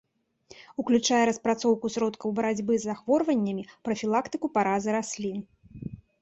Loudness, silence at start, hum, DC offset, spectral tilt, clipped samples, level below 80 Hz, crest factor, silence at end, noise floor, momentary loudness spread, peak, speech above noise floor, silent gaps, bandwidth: -27 LUFS; 0.55 s; none; under 0.1%; -4.5 dB/octave; under 0.1%; -64 dBFS; 16 dB; 0.25 s; -56 dBFS; 14 LU; -10 dBFS; 30 dB; none; 8.2 kHz